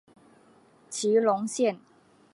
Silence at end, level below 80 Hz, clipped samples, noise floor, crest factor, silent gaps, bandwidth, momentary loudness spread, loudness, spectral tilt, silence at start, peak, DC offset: 0.55 s; -82 dBFS; under 0.1%; -59 dBFS; 20 dB; none; 11.5 kHz; 14 LU; -26 LUFS; -4 dB/octave; 0.9 s; -10 dBFS; under 0.1%